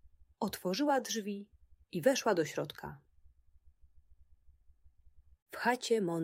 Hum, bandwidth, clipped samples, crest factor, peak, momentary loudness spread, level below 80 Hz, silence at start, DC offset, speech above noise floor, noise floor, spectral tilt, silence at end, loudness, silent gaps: none; 16 kHz; under 0.1%; 22 dB; -14 dBFS; 14 LU; -68 dBFS; 0.05 s; under 0.1%; 31 dB; -64 dBFS; -4 dB/octave; 0 s; -34 LUFS; 5.42-5.46 s